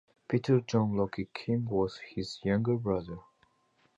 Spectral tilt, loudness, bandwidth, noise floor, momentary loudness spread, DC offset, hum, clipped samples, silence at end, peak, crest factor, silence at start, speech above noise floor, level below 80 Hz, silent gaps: -7.5 dB/octave; -31 LUFS; 8 kHz; -70 dBFS; 11 LU; under 0.1%; none; under 0.1%; 0.75 s; -14 dBFS; 18 dB; 0.3 s; 40 dB; -58 dBFS; none